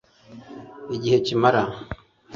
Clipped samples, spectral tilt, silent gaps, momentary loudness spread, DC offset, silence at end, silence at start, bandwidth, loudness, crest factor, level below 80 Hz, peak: under 0.1%; -6 dB/octave; none; 22 LU; under 0.1%; 0 s; 0.3 s; 7.4 kHz; -22 LUFS; 20 dB; -52 dBFS; -4 dBFS